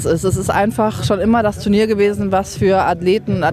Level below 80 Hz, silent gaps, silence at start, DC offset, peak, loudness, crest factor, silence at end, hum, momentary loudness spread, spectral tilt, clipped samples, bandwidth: -38 dBFS; none; 0 s; under 0.1%; -2 dBFS; -16 LUFS; 12 dB; 0 s; none; 3 LU; -6 dB/octave; under 0.1%; 15 kHz